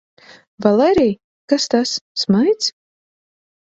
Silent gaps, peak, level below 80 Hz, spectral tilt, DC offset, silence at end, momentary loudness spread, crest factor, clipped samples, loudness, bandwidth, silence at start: 1.24-1.48 s, 2.01-2.15 s; 0 dBFS; -52 dBFS; -4.5 dB/octave; under 0.1%; 0.9 s; 8 LU; 18 dB; under 0.1%; -17 LUFS; 8 kHz; 0.6 s